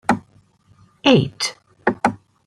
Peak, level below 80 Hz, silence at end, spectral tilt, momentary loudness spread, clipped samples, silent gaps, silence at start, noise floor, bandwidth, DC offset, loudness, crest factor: -2 dBFS; -56 dBFS; 0.3 s; -5 dB/octave; 9 LU; under 0.1%; none; 0.1 s; -55 dBFS; 14.5 kHz; under 0.1%; -20 LUFS; 20 dB